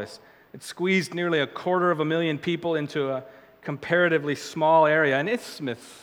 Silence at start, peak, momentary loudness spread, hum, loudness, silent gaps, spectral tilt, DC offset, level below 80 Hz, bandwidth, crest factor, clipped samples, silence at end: 0 s; -8 dBFS; 15 LU; none; -24 LUFS; none; -5.5 dB/octave; under 0.1%; -72 dBFS; 18 kHz; 18 dB; under 0.1%; 0.05 s